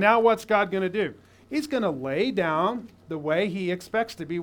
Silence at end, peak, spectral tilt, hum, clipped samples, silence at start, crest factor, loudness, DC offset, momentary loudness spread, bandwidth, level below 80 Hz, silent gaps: 0 s; -4 dBFS; -6 dB/octave; none; under 0.1%; 0 s; 22 dB; -26 LUFS; under 0.1%; 11 LU; 19 kHz; -64 dBFS; none